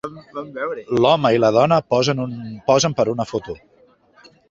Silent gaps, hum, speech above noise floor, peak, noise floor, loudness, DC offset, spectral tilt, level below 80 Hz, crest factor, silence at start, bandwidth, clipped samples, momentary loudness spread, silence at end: none; none; 36 dB; -2 dBFS; -55 dBFS; -18 LUFS; under 0.1%; -5 dB/octave; -54 dBFS; 18 dB; 0.05 s; 7.8 kHz; under 0.1%; 17 LU; 0.95 s